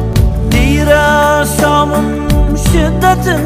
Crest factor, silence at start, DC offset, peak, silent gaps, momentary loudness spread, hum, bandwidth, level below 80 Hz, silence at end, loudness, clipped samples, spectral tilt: 10 dB; 0 s; under 0.1%; 0 dBFS; none; 4 LU; none; 16 kHz; -16 dBFS; 0 s; -11 LUFS; under 0.1%; -5.5 dB/octave